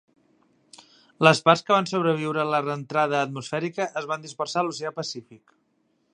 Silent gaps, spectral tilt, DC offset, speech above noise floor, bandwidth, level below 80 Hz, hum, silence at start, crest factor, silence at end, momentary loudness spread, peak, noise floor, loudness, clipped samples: none; -5 dB/octave; under 0.1%; 45 dB; 11 kHz; -74 dBFS; none; 1.2 s; 24 dB; 0.75 s; 12 LU; 0 dBFS; -69 dBFS; -24 LUFS; under 0.1%